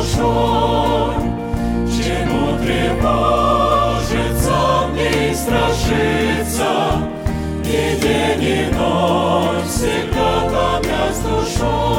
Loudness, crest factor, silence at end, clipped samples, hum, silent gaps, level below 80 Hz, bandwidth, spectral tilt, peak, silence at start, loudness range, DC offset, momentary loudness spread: -17 LUFS; 14 dB; 0 s; under 0.1%; none; none; -26 dBFS; 17 kHz; -5 dB/octave; -2 dBFS; 0 s; 1 LU; under 0.1%; 4 LU